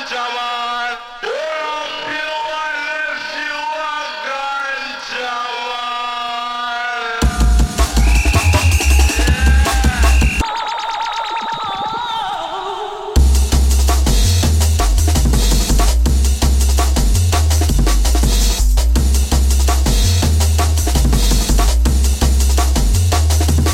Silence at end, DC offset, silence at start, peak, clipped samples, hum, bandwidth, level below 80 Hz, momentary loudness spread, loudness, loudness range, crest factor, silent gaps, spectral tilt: 0 s; under 0.1%; 0 s; 0 dBFS; under 0.1%; none; 16.5 kHz; -16 dBFS; 8 LU; -16 LUFS; 7 LU; 14 dB; none; -4 dB/octave